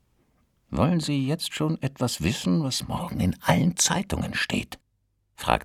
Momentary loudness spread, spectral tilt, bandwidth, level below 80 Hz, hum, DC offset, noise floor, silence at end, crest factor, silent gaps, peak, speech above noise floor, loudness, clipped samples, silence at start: 8 LU; -4.5 dB/octave; 16 kHz; -44 dBFS; none; under 0.1%; -71 dBFS; 0 s; 24 dB; none; -2 dBFS; 46 dB; -26 LUFS; under 0.1%; 0.7 s